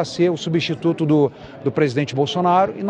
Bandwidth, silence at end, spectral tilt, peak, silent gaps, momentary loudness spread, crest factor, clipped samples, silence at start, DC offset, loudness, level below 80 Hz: 9.4 kHz; 0 s; -6.5 dB/octave; -4 dBFS; none; 5 LU; 16 dB; under 0.1%; 0 s; under 0.1%; -19 LUFS; -58 dBFS